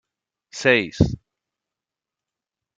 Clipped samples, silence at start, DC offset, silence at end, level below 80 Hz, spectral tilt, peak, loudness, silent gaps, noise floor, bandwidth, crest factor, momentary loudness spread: under 0.1%; 0.55 s; under 0.1%; 1.6 s; -42 dBFS; -5.5 dB/octave; -2 dBFS; -20 LUFS; none; -88 dBFS; 9.2 kHz; 22 dB; 19 LU